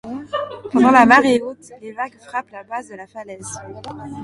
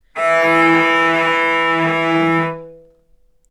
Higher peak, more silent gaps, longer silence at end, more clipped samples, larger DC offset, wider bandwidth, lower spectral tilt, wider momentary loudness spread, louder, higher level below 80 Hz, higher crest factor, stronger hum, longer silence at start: about the same, 0 dBFS vs 0 dBFS; neither; second, 0 s vs 0.75 s; neither; neither; about the same, 11.5 kHz vs 12.5 kHz; about the same, -4.5 dB/octave vs -5.5 dB/octave; first, 23 LU vs 6 LU; about the same, -16 LUFS vs -14 LUFS; about the same, -56 dBFS vs -58 dBFS; about the same, 18 dB vs 16 dB; neither; about the same, 0.05 s vs 0.15 s